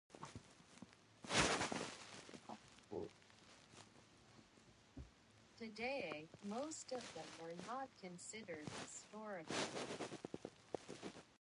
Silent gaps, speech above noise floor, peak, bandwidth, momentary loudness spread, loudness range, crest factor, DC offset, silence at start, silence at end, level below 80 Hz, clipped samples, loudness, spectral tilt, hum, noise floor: none; 19 dB; -22 dBFS; 11.5 kHz; 21 LU; 13 LU; 26 dB; under 0.1%; 0.1 s; 0.05 s; -70 dBFS; under 0.1%; -47 LUFS; -3 dB/octave; none; -69 dBFS